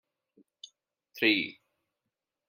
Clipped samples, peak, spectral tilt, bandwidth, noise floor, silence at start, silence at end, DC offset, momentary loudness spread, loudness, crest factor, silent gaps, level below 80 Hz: under 0.1%; -10 dBFS; -4 dB/octave; 16 kHz; -87 dBFS; 1.15 s; 1 s; under 0.1%; 25 LU; -28 LUFS; 26 dB; none; -86 dBFS